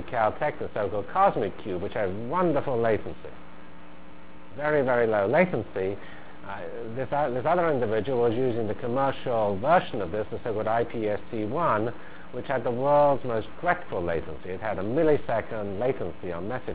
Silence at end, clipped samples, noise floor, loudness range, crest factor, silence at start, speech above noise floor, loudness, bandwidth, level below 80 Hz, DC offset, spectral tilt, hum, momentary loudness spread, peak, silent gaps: 0 s; under 0.1%; -48 dBFS; 2 LU; 20 dB; 0 s; 22 dB; -27 LUFS; 4 kHz; -52 dBFS; 2%; -10.5 dB/octave; none; 13 LU; -8 dBFS; none